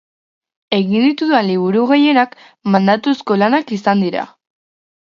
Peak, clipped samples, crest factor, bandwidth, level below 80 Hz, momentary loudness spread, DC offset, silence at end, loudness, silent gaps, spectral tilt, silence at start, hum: 0 dBFS; under 0.1%; 16 dB; 7.2 kHz; -64 dBFS; 8 LU; under 0.1%; 0.9 s; -15 LUFS; none; -7 dB/octave; 0.7 s; none